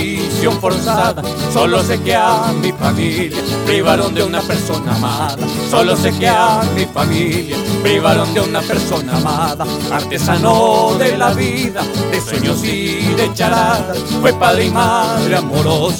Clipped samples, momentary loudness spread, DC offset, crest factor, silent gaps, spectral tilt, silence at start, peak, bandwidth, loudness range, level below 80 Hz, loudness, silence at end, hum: under 0.1%; 6 LU; under 0.1%; 14 dB; none; -5 dB/octave; 0 s; 0 dBFS; over 20 kHz; 1 LU; -40 dBFS; -14 LUFS; 0 s; none